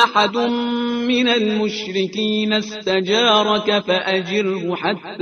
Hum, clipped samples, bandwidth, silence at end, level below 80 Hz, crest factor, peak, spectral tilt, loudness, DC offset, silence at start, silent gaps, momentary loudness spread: none; under 0.1%; 6.8 kHz; 0 s; -62 dBFS; 18 dB; 0 dBFS; -4.5 dB/octave; -18 LUFS; under 0.1%; 0 s; none; 7 LU